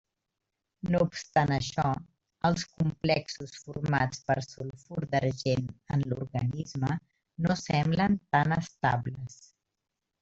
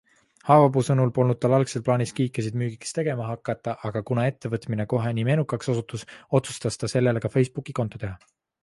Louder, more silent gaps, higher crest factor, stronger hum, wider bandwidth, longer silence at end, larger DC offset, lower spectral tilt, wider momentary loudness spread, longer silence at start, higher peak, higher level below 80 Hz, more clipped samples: second, -30 LUFS vs -24 LUFS; neither; about the same, 20 dB vs 20 dB; neither; second, 8 kHz vs 11.5 kHz; first, 0.85 s vs 0.45 s; neither; about the same, -6 dB/octave vs -7 dB/octave; first, 13 LU vs 10 LU; first, 0.85 s vs 0.45 s; second, -10 dBFS vs -4 dBFS; about the same, -56 dBFS vs -56 dBFS; neither